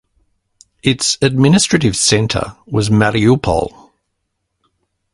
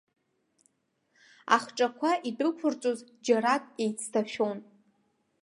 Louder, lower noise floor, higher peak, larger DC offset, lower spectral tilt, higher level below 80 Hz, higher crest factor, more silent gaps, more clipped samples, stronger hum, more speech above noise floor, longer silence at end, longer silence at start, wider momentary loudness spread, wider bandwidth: first, -14 LUFS vs -29 LUFS; about the same, -72 dBFS vs -75 dBFS; first, 0 dBFS vs -6 dBFS; neither; about the same, -4.5 dB/octave vs -3.5 dB/octave; first, -38 dBFS vs -84 dBFS; second, 16 dB vs 24 dB; neither; neither; neither; first, 58 dB vs 46 dB; first, 1.45 s vs 0.8 s; second, 0.85 s vs 1.45 s; about the same, 8 LU vs 7 LU; about the same, 11.5 kHz vs 11.5 kHz